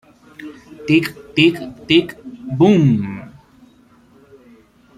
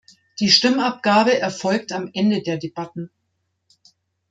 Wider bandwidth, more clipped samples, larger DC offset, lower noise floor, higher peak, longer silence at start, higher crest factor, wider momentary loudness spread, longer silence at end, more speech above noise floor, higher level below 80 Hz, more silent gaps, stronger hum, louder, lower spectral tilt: first, 14 kHz vs 9.2 kHz; neither; neither; second, -50 dBFS vs -73 dBFS; about the same, -2 dBFS vs -2 dBFS; about the same, 0.4 s vs 0.4 s; about the same, 18 dB vs 20 dB; first, 23 LU vs 18 LU; first, 1.7 s vs 1.25 s; second, 34 dB vs 53 dB; first, -54 dBFS vs -66 dBFS; neither; neither; first, -16 LUFS vs -19 LUFS; first, -7 dB/octave vs -4 dB/octave